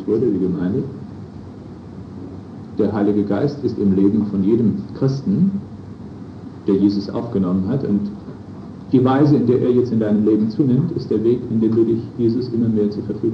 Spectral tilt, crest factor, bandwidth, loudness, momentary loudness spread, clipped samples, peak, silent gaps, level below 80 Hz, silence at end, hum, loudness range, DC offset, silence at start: -10 dB/octave; 16 dB; 6.4 kHz; -18 LUFS; 19 LU; under 0.1%; -4 dBFS; none; -52 dBFS; 0 s; none; 5 LU; under 0.1%; 0 s